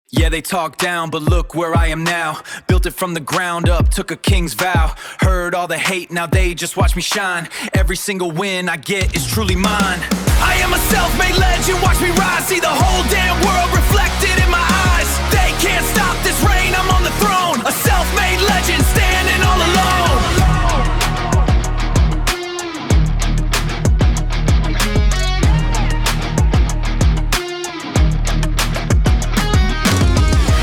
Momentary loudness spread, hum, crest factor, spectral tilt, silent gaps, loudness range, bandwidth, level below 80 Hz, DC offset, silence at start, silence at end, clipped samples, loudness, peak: 5 LU; none; 14 dB; -4 dB/octave; none; 4 LU; 19 kHz; -18 dBFS; 0.5%; 0.15 s; 0 s; under 0.1%; -16 LUFS; 0 dBFS